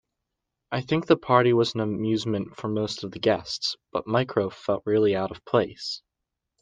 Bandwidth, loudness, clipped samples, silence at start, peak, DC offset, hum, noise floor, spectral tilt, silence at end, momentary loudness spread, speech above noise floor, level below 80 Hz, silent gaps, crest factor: 9.6 kHz; -25 LUFS; under 0.1%; 0.7 s; -4 dBFS; under 0.1%; none; -84 dBFS; -6 dB/octave; 0.65 s; 11 LU; 59 dB; -62 dBFS; none; 22 dB